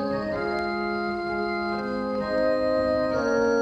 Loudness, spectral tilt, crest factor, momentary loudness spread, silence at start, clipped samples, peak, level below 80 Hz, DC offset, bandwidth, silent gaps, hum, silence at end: -26 LUFS; -6 dB/octave; 14 dB; 5 LU; 0 s; under 0.1%; -12 dBFS; -50 dBFS; under 0.1%; 8.8 kHz; none; none; 0 s